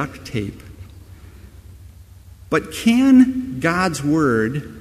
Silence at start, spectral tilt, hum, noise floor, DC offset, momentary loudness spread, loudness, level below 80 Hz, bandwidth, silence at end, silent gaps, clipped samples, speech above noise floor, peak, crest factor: 0 s; -6 dB/octave; none; -43 dBFS; under 0.1%; 15 LU; -18 LUFS; -44 dBFS; 14 kHz; 0 s; none; under 0.1%; 25 dB; -2 dBFS; 18 dB